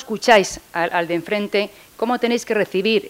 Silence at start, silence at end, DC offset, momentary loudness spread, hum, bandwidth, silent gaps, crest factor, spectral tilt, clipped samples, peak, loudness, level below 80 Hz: 0 s; 0 s; under 0.1%; 9 LU; none; 16 kHz; none; 20 dB; -3.5 dB/octave; under 0.1%; 0 dBFS; -19 LUFS; -54 dBFS